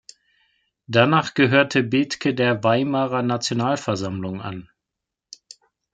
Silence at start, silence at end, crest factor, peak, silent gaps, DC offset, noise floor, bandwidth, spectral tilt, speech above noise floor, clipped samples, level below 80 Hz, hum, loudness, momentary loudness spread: 0.9 s; 1.3 s; 20 dB; -2 dBFS; none; under 0.1%; -84 dBFS; 9.2 kHz; -5.5 dB/octave; 64 dB; under 0.1%; -64 dBFS; none; -20 LUFS; 12 LU